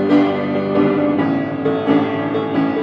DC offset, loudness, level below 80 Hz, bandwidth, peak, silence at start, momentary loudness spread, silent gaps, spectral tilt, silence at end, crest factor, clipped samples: under 0.1%; -17 LUFS; -60 dBFS; 5.6 kHz; -2 dBFS; 0 s; 4 LU; none; -9 dB/octave; 0 s; 14 dB; under 0.1%